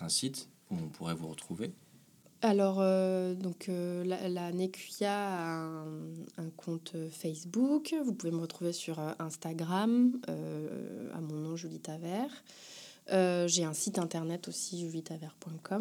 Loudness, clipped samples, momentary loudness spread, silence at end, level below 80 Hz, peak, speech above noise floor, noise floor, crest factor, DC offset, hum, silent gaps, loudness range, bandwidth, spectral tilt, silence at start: -35 LUFS; under 0.1%; 14 LU; 0 s; -80 dBFS; -14 dBFS; 27 dB; -62 dBFS; 20 dB; under 0.1%; none; none; 4 LU; 19.5 kHz; -5 dB/octave; 0 s